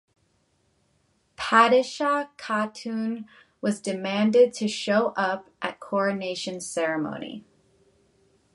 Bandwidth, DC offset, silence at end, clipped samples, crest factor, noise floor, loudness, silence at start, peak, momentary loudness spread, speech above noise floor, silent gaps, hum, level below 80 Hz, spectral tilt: 11.5 kHz; under 0.1%; 1.15 s; under 0.1%; 22 dB; -68 dBFS; -25 LUFS; 1.4 s; -4 dBFS; 14 LU; 44 dB; none; none; -70 dBFS; -4.5 dB/octave